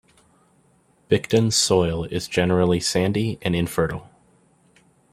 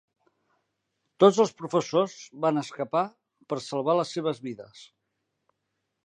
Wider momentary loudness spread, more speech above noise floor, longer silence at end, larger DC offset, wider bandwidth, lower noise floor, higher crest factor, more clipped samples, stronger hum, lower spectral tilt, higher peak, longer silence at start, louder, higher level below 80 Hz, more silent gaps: second, 7 LU vs 14 LU; second, 39 dB vs 55 dB; second, 1.1 s vs 1.25 s; neither; first, 15.5 kHz vs 9.8 kHz; second, -60 dBFS vs -80 dBFS; about the same, 20 dB vs 24 dB; neither; neither; about the same, -4.5 dB/octave vs -5.5 dB/octave; about the same, -4 dBFS vs -4 dBFS; about the same, 1.1 s vs 1.2 s; first, -21 LUFS vs -26 LUFS; first, -48 dBFS vs -80 dBFS; neither